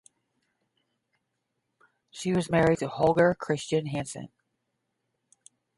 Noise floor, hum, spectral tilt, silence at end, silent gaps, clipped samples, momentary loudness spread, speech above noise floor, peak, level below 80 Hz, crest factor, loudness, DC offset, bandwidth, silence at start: -80 dBFS; none; -6 dB/octave; 1.5 s; none; under 0.1%; 18 LU; 55 dB; -10 dBFS; -58 dBFS; 20 dB; -26 LUFS; under 0.1%; 11.5 kHz; 2.15 s